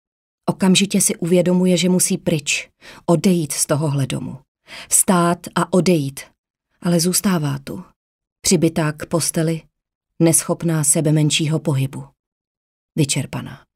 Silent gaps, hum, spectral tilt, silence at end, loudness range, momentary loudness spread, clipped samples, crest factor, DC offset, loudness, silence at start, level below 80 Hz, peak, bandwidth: 4.48-4.55 s, 6.38-6.44 s, 6.50-6.54 s, 7.96-8.19 s, 8.32-8.36 s, 9.95-10.01 s, 12.19-12.89 s; none; -4.5 dB/octave; 0.2 s; 3 LU; 13 LU; under 0.1%; 18 dB; under 0.1%; -18 LUFS; 0.45 s; -54 dBFS; 0 dBFS; 16 kHz